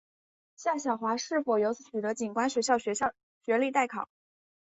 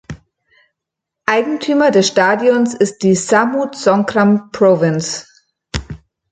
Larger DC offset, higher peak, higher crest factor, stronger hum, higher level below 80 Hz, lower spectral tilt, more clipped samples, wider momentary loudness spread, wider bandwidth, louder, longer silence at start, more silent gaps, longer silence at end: neither; second, -12 dBFS vs 0 dBFS; about the same, 20 dB vs 16 dB; neither; second, -74 dBFS vs -42 dBFS; second, -3.5 dB/octave vs -5 dB/octave; neither; second, 7 LU vs 15 LU; second, 8.4 kHz vs 9.4 kHz; second, -30 LUFS vs -14 LUFS; first, 0.6 s vs 0.1 s; first, 3.23-3.41 s vs none; first, 0.6 s vs 0.35 s